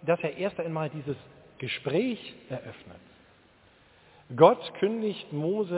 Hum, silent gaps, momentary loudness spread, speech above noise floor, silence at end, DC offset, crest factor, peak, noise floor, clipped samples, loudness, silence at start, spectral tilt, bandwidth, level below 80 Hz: none; none; 19 LU; 32 dB; 0 s; under 0.1%; 24 dB; -4 dBFS; -60 dBFS; under 0.1%; -28 LUFS; 0.05 s; -5 dB/octave; 4 kHz; -68 dBFS